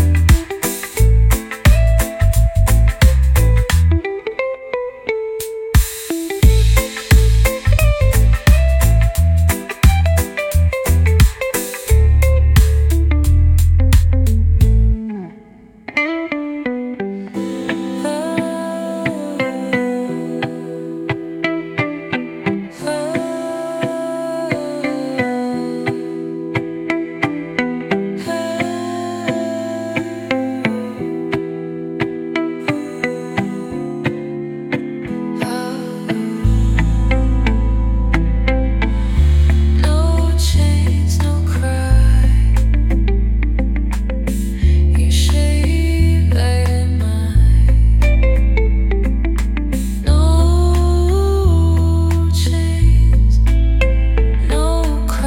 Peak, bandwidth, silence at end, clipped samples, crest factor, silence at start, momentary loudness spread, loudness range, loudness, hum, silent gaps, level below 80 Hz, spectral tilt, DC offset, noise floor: 0 dBFS; 17 kHz; 0 s; under 0.1%; 14 dB; 0 s; 10 LU; 7 LU; -17 LUFS; none; none; -16 dBFS; -6 dB/octave; under 0.1%; -42 dBFS